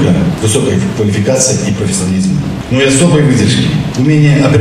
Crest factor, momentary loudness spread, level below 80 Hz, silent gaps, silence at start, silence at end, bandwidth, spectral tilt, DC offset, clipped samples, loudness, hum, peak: 10 dB; 5 LU; -32 dBFS; none; 0 s; 0 s; 14 kHz; -5 dB/octave; under 0.1%; under 0.1%; -10 LUFS; none; 0 dBFS